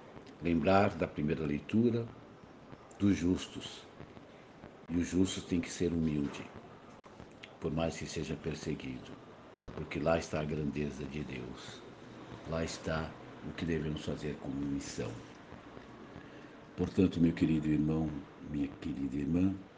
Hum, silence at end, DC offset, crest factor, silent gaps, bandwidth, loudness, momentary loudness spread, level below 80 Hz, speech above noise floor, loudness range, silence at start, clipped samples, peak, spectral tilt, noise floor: none; 0 s; under 0.1%; 22 dB; none; 9.6 kHz; -35 LUFS; 22 LU; -56 dBFS; 20 dB; 7 LU; 0 s; under 0.1%; -12 dBFS; -6.5 dB/octave; -54 dBFS